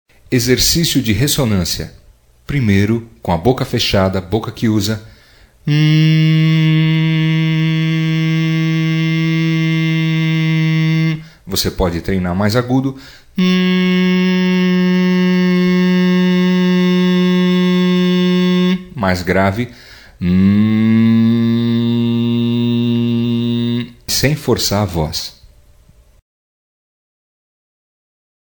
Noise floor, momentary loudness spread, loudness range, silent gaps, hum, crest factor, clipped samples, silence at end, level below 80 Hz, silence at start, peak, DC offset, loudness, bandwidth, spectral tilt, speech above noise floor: -47 dBFS; 7 LU; 4 LU; none; none; 14 dB; under 0.1%; 3.1 s; -38 dBFS; 0.3 s; 0 dBFS; under 0.1%; -14 LUFS; 19 kHz; -5.5 dB/octave; 33 dB